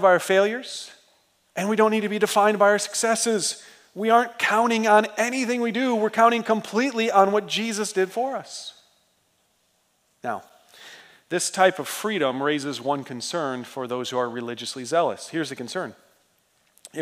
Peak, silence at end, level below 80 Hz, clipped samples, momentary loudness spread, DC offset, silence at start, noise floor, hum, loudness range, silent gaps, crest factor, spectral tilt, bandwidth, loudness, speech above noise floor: -4 dBFS; 0 s; -82 dBFS; under 0.1%; 14 LU; under 0.1%; 0 s; -67 dBFS; none; 8 LU; none; 20 dB; -3 dB/octave; 16 kHz; -23 LUFS; 45 dB